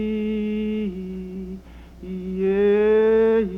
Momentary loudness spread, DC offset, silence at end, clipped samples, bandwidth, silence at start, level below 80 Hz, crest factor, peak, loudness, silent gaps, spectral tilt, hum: 17 LU; under 0.1%; 0 s; under 0.1%; 4 kHz; 0 s; -44 dBFS; 12 dB; -8 dBFS; -21 LUFS; none; -9 dB/octave; none